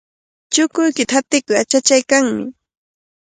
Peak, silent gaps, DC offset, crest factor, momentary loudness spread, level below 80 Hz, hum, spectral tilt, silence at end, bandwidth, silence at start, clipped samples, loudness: 0 dBFS; none; under 0.1%; 18 dB; 7 LU; -62 dBFS; none; -2 dB/octave; 0.7 s; 10.5 kHz; 0.5 s; under 0.1%; -15 LUFS